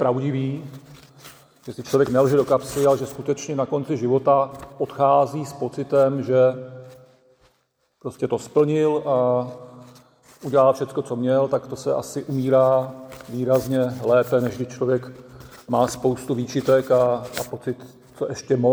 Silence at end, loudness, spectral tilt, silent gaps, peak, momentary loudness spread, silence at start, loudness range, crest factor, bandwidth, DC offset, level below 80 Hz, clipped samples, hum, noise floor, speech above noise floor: 0 s; -21 LUFS; -6.5 dB/octave; none; -6 dBFS; 16 LU; 0 s; 3 LU; 16 dB; over 20 kHz; under 0.1%; -58 dBFS; under 0.1%; none; -68 dBFS; 47 dB